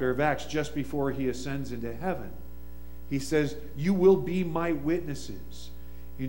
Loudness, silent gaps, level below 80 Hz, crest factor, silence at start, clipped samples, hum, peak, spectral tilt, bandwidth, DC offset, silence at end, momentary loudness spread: -29 LUFS; none; -46 dBFS; 20 dB; 0 s; under 0.1%; none; -10 dBFS; -6.5 dB/octave; 16.5 kHz; 1%; 0 s; 23 LU